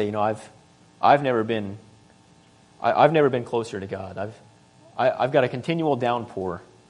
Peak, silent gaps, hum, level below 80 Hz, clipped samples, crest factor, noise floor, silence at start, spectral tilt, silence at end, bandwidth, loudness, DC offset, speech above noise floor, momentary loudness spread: -2 dBFS; none; none; -66 dBFS; under 0.1%; 22 dB; -55 dBFS; 0 s; -7 dB/octave; 0.3 s; 10.5 kHz; -23 LUFS; under 0.1%; 32 dB; 16 LU